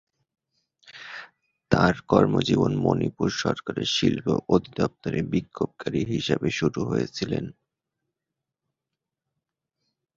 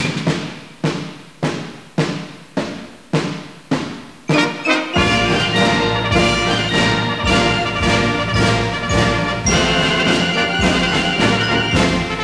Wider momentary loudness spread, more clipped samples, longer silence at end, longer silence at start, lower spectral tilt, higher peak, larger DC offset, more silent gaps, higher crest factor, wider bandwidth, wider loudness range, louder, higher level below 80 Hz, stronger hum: about the same, 10 LU vs 11 LU; neither; first, 2.65 s vs 0 s; first, 0.85 s vs 0 s; first, -6 dB/octave vs -4.5 dB/octave; about the same, -2 dBFS vs -2 dBFS; second, under 0.1% vs 0.4%; neither; first, 24 dB vs 16 dB; second, 7.8 kHz vs 11 kHz; about the same, 8 LU vs 9 LU; second, -25 LUFS vs -16 LUFS; second, -52 dBFS vs -34 dBFS; neither